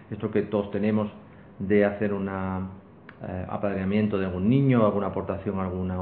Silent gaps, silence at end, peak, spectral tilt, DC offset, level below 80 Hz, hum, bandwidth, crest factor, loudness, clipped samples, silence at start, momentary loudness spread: none; 0 s; -8 dBFS; -12 dB/octave; under 0.1%; -58 dBFS; none; 4.3 kHz; 18 dB; -26 LUFS; under 0.1%; 0 s; 13 LU